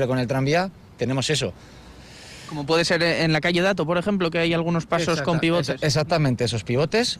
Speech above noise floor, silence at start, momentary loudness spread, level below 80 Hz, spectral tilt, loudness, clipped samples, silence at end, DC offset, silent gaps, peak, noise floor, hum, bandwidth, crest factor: 21 dB; 0 s; 11 LU; -50 dBFS; -5 dB/octave; -22 LUFS; under 0.1%; 0 s; under 0.1%; none; -10 dBFS; -43 dBFS; none; 14.5 kHz; 12 dB